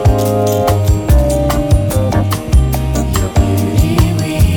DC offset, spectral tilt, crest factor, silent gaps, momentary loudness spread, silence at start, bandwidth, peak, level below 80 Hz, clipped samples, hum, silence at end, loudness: under 0.1%; -6.5 dB/octave; 10 dB; none; 3 LU; 0 s; 19 kHz; 0 dBFS; -16 dBFS; under 0.1%; none; 0 s; -13 LUFS